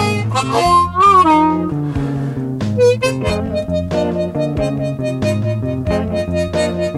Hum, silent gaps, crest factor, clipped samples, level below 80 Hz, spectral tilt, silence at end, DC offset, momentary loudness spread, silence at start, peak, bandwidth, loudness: none; none; 14 dB; under 0.1%; -36 dBFS; -6.5 dB/octave; 0 s; under 0.1%; 10 LU; 0 s; 0 dBFS; 12.5 kHz; -16 LUFS